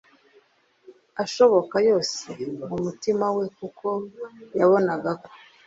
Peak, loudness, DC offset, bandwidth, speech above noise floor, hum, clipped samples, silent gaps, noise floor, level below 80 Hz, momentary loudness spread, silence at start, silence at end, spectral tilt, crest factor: -6 dBFS; -24 LUFS; under 0.1%; 7.8 kHz; 38 dB; none; under 0.1%; none; -61 dBFS; -66 dBFS; 14 LU; 0.9 s; 0.3 s; -5 dB/octave; 20 dB